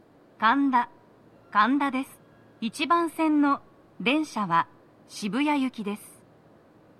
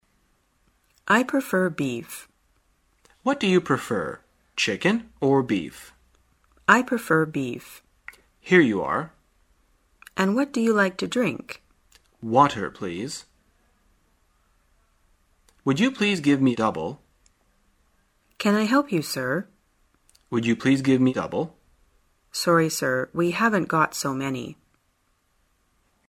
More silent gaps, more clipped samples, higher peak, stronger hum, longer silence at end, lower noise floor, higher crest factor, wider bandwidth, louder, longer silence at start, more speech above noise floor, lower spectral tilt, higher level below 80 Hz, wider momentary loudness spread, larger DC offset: neither; neither; second, -8 dBFS vs 0 dBFS; neither; second, 0.9 s vs 1.6 s; second, -56 dBFS vs -68 dBFS; second, 18 dB vs 24 dB; second, 14 kHz vs 16 kHz; second, -26 LUFS vs -23 LUFS; second, 0.4 s vs 1.05 s; second, 31 dB vs 46 dB; about the same, -4.5 dB/octave vs -5 dB/octave; second, -74 dBFS vs -62 dBFS; second, 13 LU vs 18 LU; neither